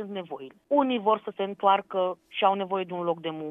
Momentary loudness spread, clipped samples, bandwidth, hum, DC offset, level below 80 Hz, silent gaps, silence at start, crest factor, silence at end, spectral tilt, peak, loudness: 12 LU; under 0.1%; 3.9 kHz; none; under 0.1%; -80 dBFS; none; 0 s; 20 dB; 0 s; -7.5 dB/octave; -8 dBFS; -27 LUFS